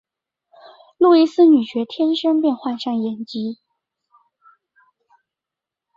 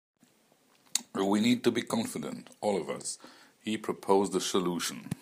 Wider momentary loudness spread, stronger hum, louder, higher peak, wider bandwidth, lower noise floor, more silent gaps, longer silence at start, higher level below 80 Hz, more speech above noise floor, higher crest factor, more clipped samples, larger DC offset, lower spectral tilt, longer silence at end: about the same, 14 LU vs 12 LU; neither; first, -18 LUFS vs -31 LUFS; first, -4 dBFS vs -8 dBFS; second, 7.2 kHz vs 15.5 kHz; first, -87 dBFS vs -66 dBFS; neither; about the same, 1 s vs 0.95 s; first, -70 dBFS vs -76 dBFS; first, 70 dB vs 36 dB; second, 16 dB vs 24 dB; neither; neither; first, -6.5 dB/octave vs -4 dB/octave; first, 2.4 s vs 0.05 s